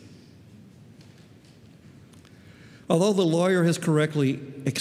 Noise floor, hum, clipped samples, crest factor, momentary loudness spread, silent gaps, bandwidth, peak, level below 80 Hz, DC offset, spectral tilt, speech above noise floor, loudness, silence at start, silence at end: -51 dBFS; none; under 0.1%; 20 dB; 6 LU; none; 14.5 kHz; -6 dBFS; -70 dBFS; under 0.1%; -6 dB/octave; 29 dB; -23 LUFS; 0.05 s; 0 s